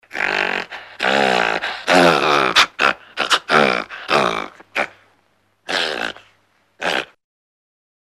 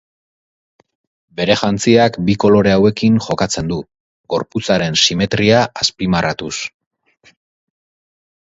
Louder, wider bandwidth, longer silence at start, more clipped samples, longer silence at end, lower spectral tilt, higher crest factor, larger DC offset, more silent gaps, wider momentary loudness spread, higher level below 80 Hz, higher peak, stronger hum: about the same, -17 LUFS vs -15 LUFS; first, 15.5 kHz vs 8 kHz; second, 0.15 s vs 1.35 s; neither; second, 1.1 s vs 1.8 s; second, -3 dB/octave vs -4.5 dB/octave; about the same, 18 dB vs 16 dB; neither; second, none vs 4.00-4.24 s; about the same, 12 LU vs 11 LU; second, -56 dBFS vs -44 dBFS; about the same, -2 dBFS vs 0 dBFS; neither